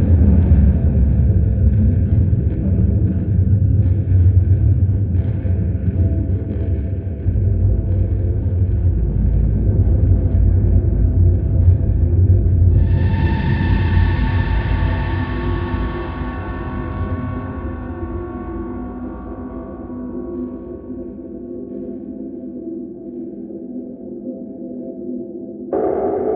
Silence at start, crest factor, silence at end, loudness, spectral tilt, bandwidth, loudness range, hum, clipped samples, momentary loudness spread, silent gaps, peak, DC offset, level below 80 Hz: 0 s; 14 dB; 0 s; -18 LUFS; -12.5 dB/octave; 4.2 kHz; 14 LU; none; under 0.1%; 15 LU; none; -2 dBFS; under 0.1%; -22 dBFS